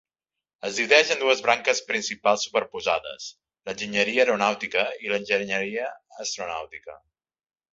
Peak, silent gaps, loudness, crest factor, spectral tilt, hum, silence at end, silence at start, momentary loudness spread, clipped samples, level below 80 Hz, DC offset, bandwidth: 0 dBFS; none; -24 LUFS; 26 dB; -2 dB/octave; none; 0.75 s; 0.65 s; 16 LU; under 0.1%; -68 dBFS; under 0.1%; 8 kHz